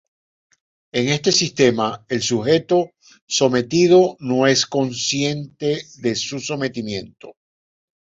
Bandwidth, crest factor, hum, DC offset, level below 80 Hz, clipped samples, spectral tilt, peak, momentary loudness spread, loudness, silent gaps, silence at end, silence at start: 7.8 kHz; 18 dB; none; under 0.1%; -58 dBFS; under 0.1%; -4 dB/octave; -2 dBFS; 10 LU; -19 LUFS; 3.22-3.27 s; 0.8 s; 0.95 s